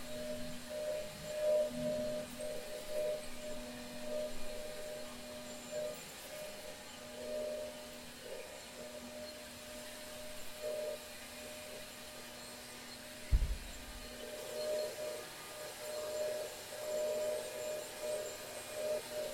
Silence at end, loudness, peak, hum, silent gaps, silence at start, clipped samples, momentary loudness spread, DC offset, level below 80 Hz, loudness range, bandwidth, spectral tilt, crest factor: 0 s; -43 LUFS; -18 dBFS; none; none; 0 s; under 0.1%; 10 LU; under 0.1%; -50 dBFS; 6 LU; 16.5 kHz; -3.5 dB/octave; 22 dB